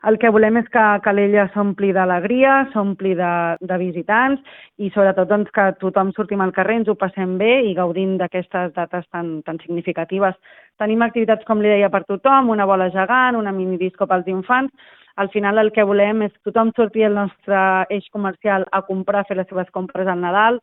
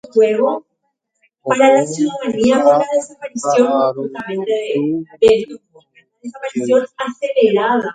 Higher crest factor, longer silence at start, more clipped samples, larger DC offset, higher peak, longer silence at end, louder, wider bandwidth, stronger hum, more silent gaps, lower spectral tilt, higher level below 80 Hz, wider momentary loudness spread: about the same, 16 dB vs 16 dB; about the same, 0.05 s vs 0.15 s; neither; neither; about the same, 0 dBFS vs 0 dBFS; about the same, 0.05 s vs 0 s; about the same, -18 LUFS vs -16 LUFS; second, 4 kHz vs 9.4 kHz; neither; neither; first, -11 dB/octave vs -5 dB/octave; second, -62 dBFS vs -56 dBFS; second, 9 LU vs 14 LU